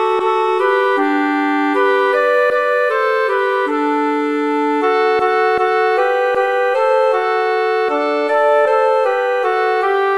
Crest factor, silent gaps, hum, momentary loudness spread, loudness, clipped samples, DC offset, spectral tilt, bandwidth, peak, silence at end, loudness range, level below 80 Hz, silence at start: 12 dB; none; none; 3 LU; -15 LUFS; under 0.1%; 0.2%; -3.5 dB/octave; 12 kHz; -2 dBFS; 0 s; 1 LU; -62 dBFS; 0 s